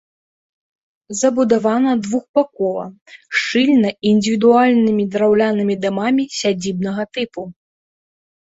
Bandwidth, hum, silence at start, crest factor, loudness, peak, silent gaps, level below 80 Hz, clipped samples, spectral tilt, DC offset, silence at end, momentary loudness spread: 8 kHz; none; 1.1 s; 16 dB; -17 LUFS; -2 dBFS; 2.29-2.34 s, 3.01-3.06 s; -60 dBFS; under 0.1%; -5 dB/octave; under 0.1%; 0.95 s; 11 LU